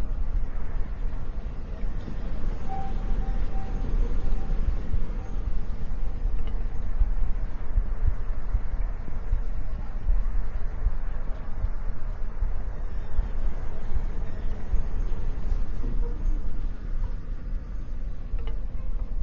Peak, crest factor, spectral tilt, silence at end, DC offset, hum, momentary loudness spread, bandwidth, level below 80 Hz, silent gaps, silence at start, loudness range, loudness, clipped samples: -10 dBFS; 12 dB; -8.5 dB/octave; 0 s; under 0.1%; none; 6 LU; 3.1 kHz; -26 dBFS; none; 0 s; 2 LU; -34 LUFS; under 0.1%